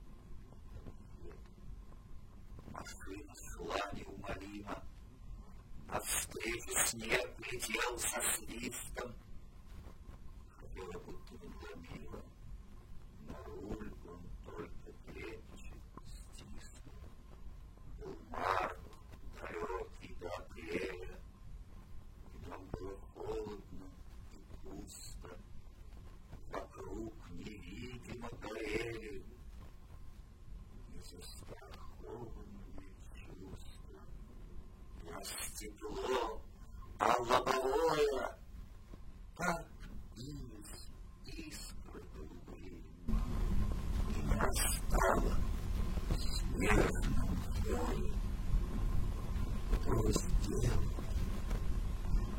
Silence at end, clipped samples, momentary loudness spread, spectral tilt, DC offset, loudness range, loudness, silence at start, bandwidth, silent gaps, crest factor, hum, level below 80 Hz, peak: 0 s; under 0.1%; 22 LU; -4.5 dB/octave; under 0.1%; 16 LU; -40 LUFS; 0 s; 16 kHz; none; 26 dB; none; -44 dBFS; -14 dBFS